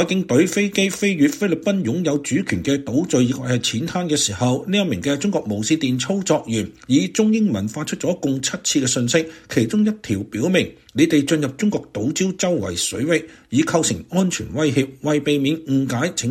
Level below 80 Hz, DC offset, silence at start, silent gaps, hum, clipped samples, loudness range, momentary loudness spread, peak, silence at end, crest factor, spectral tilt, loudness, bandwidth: -54 dBFS; under 0.1%; 0 s; none; none; under 0.1%; 1 LU; 5 LU; -2 dBFS; 0 s; 16 dB; -4.5 dB/octave; -20 LUFS; 16.5 kHz